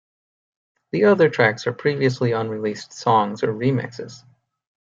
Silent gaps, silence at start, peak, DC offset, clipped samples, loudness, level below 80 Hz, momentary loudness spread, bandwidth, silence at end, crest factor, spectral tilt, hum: none; 0.95 s; -4 dBFS; under 0.1%; under 0.1%; -20 LUFS; -66 dBFS; 12 LU; 7.8 kHz; 0.75 s; 18 dB; -6.5 dB/octave; none